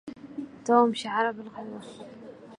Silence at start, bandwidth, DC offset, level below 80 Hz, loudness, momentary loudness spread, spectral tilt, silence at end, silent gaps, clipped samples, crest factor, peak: 0.05 s; 11 kHz; under 0.1%; -72 dBFS; -25 LUFS; 22 LU; -4.5 dB/octave; 0.05 s; none; under 0.1%; 22 dB; -8 dBFS